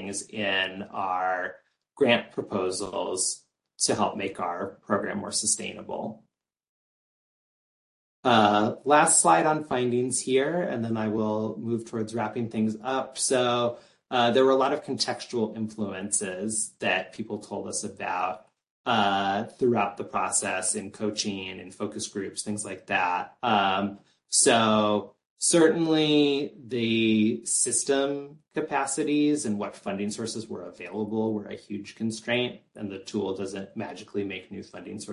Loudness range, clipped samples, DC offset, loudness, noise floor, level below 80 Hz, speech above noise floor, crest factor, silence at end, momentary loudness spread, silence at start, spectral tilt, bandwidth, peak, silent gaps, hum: 9 LU; under 0.1%; under 0.1%; -26 LUFS; under -90 dBFS; -66 dBFS; over 63 dB; 20 dB; 0 s; 14 LU; 0 s; -3 dB/octave; 11.5 kHz; -6 dBFS; 6.69-8.23 s, 18.70-18.84 s, 25.30-25.36 s; none